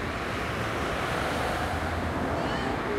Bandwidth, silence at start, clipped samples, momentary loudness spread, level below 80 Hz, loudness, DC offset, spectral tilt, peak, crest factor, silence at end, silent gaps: 16 kHz; 0 s; under 0.1%; 2 LU; -40 dBFS; -29 LUFS; under 0.1%; -5 dB/octave; -16 dBFS; 14 dB; 0 s; none